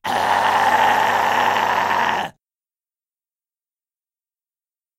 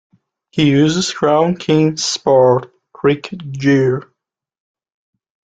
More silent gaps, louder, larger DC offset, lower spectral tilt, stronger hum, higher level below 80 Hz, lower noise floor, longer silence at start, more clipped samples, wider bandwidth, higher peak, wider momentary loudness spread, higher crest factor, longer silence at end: neither; about the same, -17 LUFS vs -15 LUFS; neither; second, -2.5 dB/octave vs -5.5 dB/octave; neither; second, -60 dBFS vs -54 dBFS; first, under -90 dBFS vs -75 dBFS; second, 0.05 s vs 0.55 s; neither; first, 16 kHz vs 9.2 kHz; about the same, -2 dBFS vs -2 dBFS; second, 5 LU vs 8 LU; about the same, 18 dB vs 14 dB; first, 2.7 s vs 1.5 s